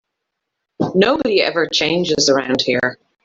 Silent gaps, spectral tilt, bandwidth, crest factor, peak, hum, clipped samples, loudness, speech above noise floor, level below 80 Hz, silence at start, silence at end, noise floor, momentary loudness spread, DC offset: none; -3.5 dB/octave; 7.8 kHz; 16 dB; -2 dBFS; none; under 0.1%; -16 LUFS; 61 dB; -54 dBFS; 0.8 s; 0.3 s; -78 dBFS; 5 LU; under 0.1%